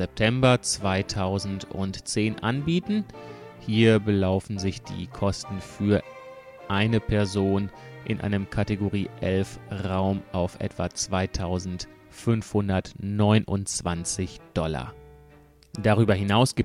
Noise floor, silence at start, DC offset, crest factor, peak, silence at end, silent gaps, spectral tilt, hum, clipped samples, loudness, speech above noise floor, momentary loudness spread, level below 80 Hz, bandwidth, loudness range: -53 dBFS; 0 s; under 0.1%; 20 dB; -6 dBFS; 0 s; none; -5.5 dB/octave; none; under 0.1%; -26 LUFS; 28 dB; 14 LU; -46 dBFS; 12.5 kHz; 3 LU